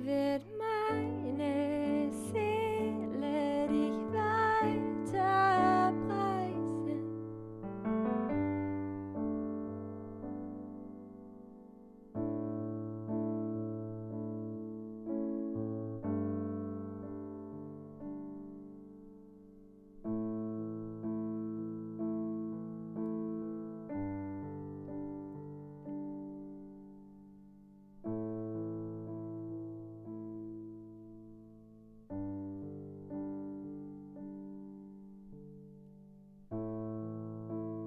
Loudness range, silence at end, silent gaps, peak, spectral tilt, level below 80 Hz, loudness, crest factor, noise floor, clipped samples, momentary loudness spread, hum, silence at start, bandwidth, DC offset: 15 LU; 0 s; none; -18 dBFS; -7.5 dB/octave; -64 dBFS; -37 LUFS; 20 dB; -58 dBFS; under 0.1%; 20 LU; none; 0 s; 12.5 kHz; under 0.1%